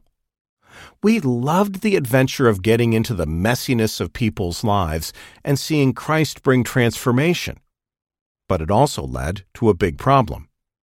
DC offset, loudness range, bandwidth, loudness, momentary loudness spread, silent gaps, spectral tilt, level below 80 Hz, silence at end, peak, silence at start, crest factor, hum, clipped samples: under 0.1%; 2 LU; 17 kHz; -19 LUFS; 9 LU; 8.21-8.35 s; -6 dB/octave; -40 dBFS; 0.45 s; -4 dBFS; 0.75 s; 16 dB; none; under 0.1%